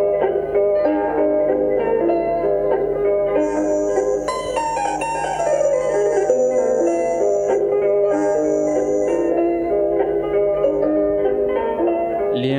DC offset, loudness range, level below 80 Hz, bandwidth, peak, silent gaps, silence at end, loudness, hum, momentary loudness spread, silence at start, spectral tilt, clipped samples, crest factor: under 0.1%; 2 LU; -46 dBFS; 11 kHz; -4 dBFS; none; 0 s; -19 LUFS; none; 3 LU; 0 s; -5.5 dB/octave; under 0.1%; 14 dB